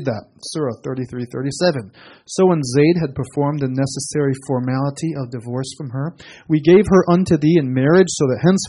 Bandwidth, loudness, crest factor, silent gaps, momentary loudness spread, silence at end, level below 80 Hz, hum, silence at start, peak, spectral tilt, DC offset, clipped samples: 11.5 kHz; -18 LUFS; 16 dB; none; 13 LU; 0 s; -48 dBFS; none; 0 s; -2 dBFS; -6.5 dB/octave; under 0.1%; under 0.1%